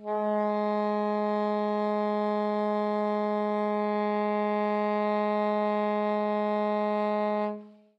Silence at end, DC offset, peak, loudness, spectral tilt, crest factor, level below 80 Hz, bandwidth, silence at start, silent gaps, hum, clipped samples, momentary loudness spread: 0.25 s; under 0.1%; -18 dBFS; -28 LUFS; -8.5 dB/octave; 10 dB; under -90 dBFS; 5.8 kHz; 0 s; none; none; under 0.1%; 1 LU